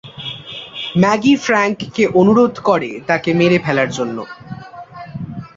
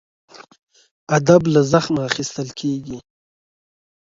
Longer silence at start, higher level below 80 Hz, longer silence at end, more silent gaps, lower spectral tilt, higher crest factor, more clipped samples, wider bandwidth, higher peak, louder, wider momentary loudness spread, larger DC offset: second, 0.05 s vs 0.4 s; about the same, -52 dBFS vs -54 dBFS; second, 0.1 s vs 1.1 s; second, none vs 0.59-0.67 s, 0.91-1.07 s; about the same, -6 dB/octave vs -5.5 dB/octave; second, 14 dB vs 20 dB; neither; about the same, 7.8 kHz vs 7.8 kHz; about the same, -2 dBFS vs 0 dBFS; first, -15 LUFS vs -18 LUFS; first, 19 LU vs 14 LU; neither